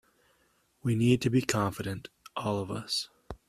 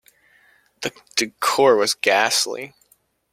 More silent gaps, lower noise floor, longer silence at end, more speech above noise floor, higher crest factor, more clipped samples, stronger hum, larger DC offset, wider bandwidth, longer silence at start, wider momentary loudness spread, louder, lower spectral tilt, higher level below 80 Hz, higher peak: neither; first, -70 dBFS vs -61 dBFS; second, 0.15 s vs 0.65 s; about the same, 41 dB vs 42 dB; about the same, 24 dB vs 20 dB; neither; neither; neither; about the same, 15 kHz vs 16.5 kHz; about the same, 0.85 s vs 0.8 s; about the same, 14 LU vs 14 LU; second, -30 LUFS vs -19 LUFS; first, -5.5 dB/octave vs -1.5 dB/octave; first, -58 dBFS vs -68 dBFS; second, -6 dBFS vs -2 dBFS